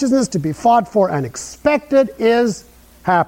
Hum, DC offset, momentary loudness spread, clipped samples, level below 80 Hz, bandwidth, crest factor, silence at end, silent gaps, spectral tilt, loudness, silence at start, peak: none; under 0.1%; 9 LU; under 0.1%; -48 dBFS; 16.5 kHz; 14 dB; 0 s; none; -5.5 dB/octave; -17 LUFS; 0 s; -2 dBFS